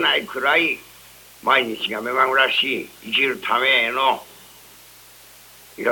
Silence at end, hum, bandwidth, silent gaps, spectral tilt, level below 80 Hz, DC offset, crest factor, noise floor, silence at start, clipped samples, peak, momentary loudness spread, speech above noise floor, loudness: 0 s; none; 18 kHz; none; -2.5 dB/octave; -62 dBFS; under 0.1%; 20 dB; -46 dBFS; 0 s; under 0.1%; -2 dBFS; 10 LU; 26 dB; -19 LUFS